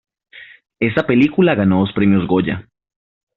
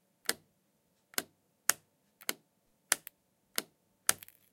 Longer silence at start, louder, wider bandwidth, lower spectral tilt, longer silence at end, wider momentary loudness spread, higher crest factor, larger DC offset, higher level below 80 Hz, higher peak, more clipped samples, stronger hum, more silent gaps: about the same, 0.35 s vs 0.3 s; first, -16 LUFS vs -35 LUFS; second, 5.4 kHz vs 17 kHz; first, -6 dB/octave vs 1 dB/octave; first, 0.75 s vs 0.35 s; second, 8 LU vs 16 LU; second, 16 dB vs 38 dB; neither; first, -50 dBFS vs -82 dBFS; about the same, -2 dBFS vs -2 dBFS; neither; neither; neither